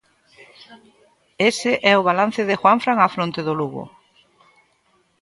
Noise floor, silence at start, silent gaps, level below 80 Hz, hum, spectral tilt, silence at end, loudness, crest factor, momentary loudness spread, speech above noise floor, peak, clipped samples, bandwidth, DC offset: -63 dBFS; 0.7 s; none; -66 dBFS; none; -4.5 dB/octave; 1.35 s; -18 LUFS; 20 dB; 10 LU; 44 dB; -2 dBFS; under 0.1%; 11.5 kHz; under 0.1%